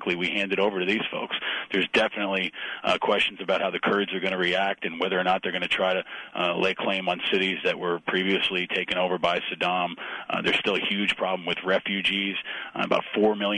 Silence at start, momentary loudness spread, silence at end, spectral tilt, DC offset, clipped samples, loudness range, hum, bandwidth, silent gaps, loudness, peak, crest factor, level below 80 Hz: 0 s; 5 LU; 0 s; -5 dB/octave; under 0.1%; under 0.1%; 1 LU; none; 10.5 kHz; none; -25 LUFS; -10 dBFS; 16 dB; -64 dBFS